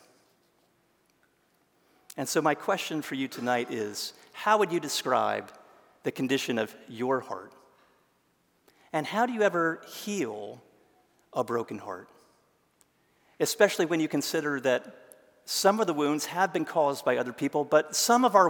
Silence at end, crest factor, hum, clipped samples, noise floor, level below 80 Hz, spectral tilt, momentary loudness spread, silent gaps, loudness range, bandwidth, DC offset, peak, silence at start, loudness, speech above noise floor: 0 s; 24 dB; none; under 0.1%; -70 dBFS; -84 dBFS; -3.5 dB/octave; 13 LU; none; 6 LU; 18 kHz; under 0.1%; -6 dBFS; 2.15 s; -28 LUFS; 42 dB